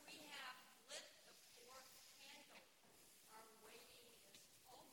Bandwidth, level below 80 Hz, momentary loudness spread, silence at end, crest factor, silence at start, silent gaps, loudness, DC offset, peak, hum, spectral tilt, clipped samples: 17 kHz; under -90 dBFS; 10 LU; 0 s; 24 dB; 0 s; none; -61 LUFS; under 0.1%; -38 dBFS; none; -0.5 dB/octave; under 0.1%